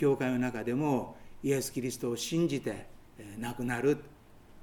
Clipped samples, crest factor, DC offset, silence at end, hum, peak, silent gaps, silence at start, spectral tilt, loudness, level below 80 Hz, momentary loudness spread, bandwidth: under 0.1%; 16 dB; under 0.1%; 0 s; none; -16 dBFS; none; 0 s; -5.5 dB/octave; -32 LUFS; -58 dBFS; 11 LU; 18.5 kHz